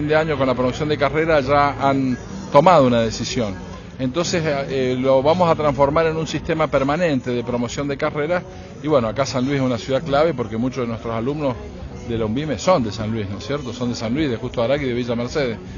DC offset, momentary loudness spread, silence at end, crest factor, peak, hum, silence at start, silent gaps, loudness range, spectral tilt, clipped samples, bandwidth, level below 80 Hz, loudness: under 0.1%; 9 LU; 0 s; 20 dB; 0 dBFS; none; 0 s; none; 5 LU; -6 dB/octave; under 0.1%; 7.4 kHz; -40 dBFS; -20 LUFS